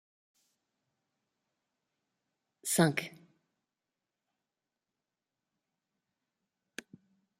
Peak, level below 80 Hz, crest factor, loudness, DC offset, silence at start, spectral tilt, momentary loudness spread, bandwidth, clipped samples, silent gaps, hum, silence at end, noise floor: -12 dBFS; -80 dBFS; 30 dB; -31 LUFS; under 0.1%; 2.65 s; -4.5 dB/octave; 21 LU; 15.5 kHz; under 0.1%; none; none; 4.3 s; -90 dBFS